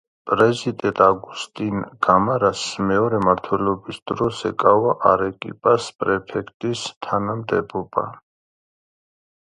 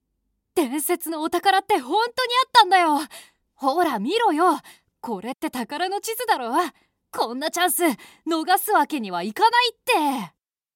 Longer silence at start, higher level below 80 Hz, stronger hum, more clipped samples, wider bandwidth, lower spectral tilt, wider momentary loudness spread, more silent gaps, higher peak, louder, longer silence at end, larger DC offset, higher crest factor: second, 0.25 s vs 0.55 s; first, -52 dBFS vs -72 dBFS; neither; neither; second, 11 kHz vs 17 kHz; first, -5.5 dB/octave vs -2 dB/octave; about the same, 10 LU vs 12 LU; first, 4.02-4.06 s, 5.95-5.99 s, 6.54-6.60 s, 6.97-7.01 s vs none; about the same, 0 dBFS vs 0 dBFS; about the same, -20 LUFS vs -22 LUFS; first, 1.4 s vs 0.45 s; neither; about the same, 20 dB vs 22 dB